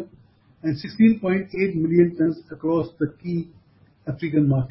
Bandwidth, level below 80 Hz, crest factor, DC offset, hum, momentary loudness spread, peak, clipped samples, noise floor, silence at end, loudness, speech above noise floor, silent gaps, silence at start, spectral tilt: 5.8 kHz; -54 dBFS; 18 dB; under 0.1%; none; 12 LU; -6 dBFS; under 0.1%; -54 dBFS; 0.05 s; -22 LUFS; 33 dB; none; 0 s; -12.5 dB/octave